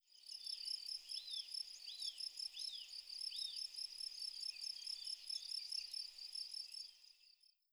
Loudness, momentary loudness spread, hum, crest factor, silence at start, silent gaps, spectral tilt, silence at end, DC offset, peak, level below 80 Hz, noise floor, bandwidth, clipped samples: -46 LUFS; 6 LU; none; 16 dB; 0.1 s; none; 5.5 dB/octave; 0.25 s; under 0.1%; -32 dBFS; -88 dBFS; -72 dBFS; over 20 kHz; under 0.1%